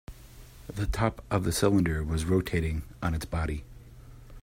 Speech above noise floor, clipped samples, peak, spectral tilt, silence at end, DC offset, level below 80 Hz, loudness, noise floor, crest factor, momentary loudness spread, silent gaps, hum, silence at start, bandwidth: 21 dB; under 0.1%; -10 dBFS; -6 dB/octave; 0 s; under 0.1%; -40 dBFS; -29 LUFS; -49 dBFS; 20 dB; 13 LU; none; none; 0.1 s; 16 kHz